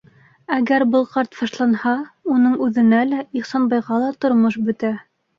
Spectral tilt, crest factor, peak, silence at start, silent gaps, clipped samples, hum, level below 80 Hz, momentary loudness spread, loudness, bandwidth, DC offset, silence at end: -6.5 dB/octave; 16 dB; -2 dBFS; 0.5 s; none; under 0.1%; none; -64 dBFS; 8 LU; -19 LUFS; 7 kHz; under 0.1%; 0.4 s